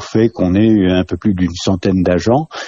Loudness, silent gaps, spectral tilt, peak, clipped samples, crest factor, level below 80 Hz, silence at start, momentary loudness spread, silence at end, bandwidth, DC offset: -14 LUFS; none; -7 dB/octave; -2 dBFS; under 0.1%; 12 dB; -40 dBFS; 0 s; 5 LU; 0 s; 7.6 kHz; under 0.1%